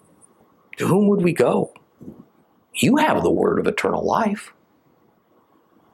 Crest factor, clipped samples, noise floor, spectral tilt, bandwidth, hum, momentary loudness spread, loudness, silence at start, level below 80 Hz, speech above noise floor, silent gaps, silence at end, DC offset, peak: 18 dB; under 0.1%; -59 dBFS; -6 dB/octave; 14.5 kHz; none; 12 LU; -20 LUFS; 0.8 s; -60 dBFS; 41 dB; none; 1.45 s; under 0.1%; -4 dBFS